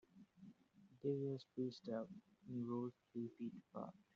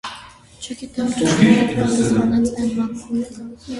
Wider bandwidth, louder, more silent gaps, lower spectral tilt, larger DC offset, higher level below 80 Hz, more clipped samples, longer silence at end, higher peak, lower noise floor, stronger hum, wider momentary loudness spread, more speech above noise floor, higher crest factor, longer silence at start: second, 7.4 kHz vs 11.5 kHz; second, -48 LUFS vs -18 LUFS; neither; first, -8 dB/octave vs -5.5 dB/octave; neither; second, -88 dBFS vs -46 dBFS; neither; first, 0.2 s vs 0 s; second, -30 dBFS vs 0 dBFS; first, -71 dBFS vs -41 dBFS; neither; about the same, 19 LU vs 19 LU; about the same, 23 dB vs 22 dB; about the same, 18 dB vs 18 dB; about the same, 0.15 s vs 0.05 s